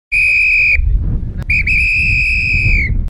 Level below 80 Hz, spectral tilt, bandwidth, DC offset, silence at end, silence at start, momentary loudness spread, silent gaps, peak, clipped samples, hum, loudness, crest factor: -18 dBFS; -5 dB/octave; 11 kHz; under 0.1%; 0 s; 0.1 s; 10 LU; none; -2 dBFS; under 0.1%; none; -11 LUFS; 12 dB